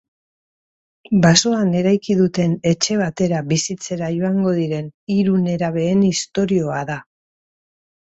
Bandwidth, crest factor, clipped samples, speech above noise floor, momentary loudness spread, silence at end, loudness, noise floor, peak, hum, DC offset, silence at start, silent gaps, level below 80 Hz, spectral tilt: 8 kHz; 18 dB; under 0.1%; over 72 dB; 9 LU; 1.1 s; -18 LUFS; under -90 dBFS; 0 dBFS; none; under 0.1%; 1.1 s; 4.94-5.07 s; -54 dBFS; -5 dB/octave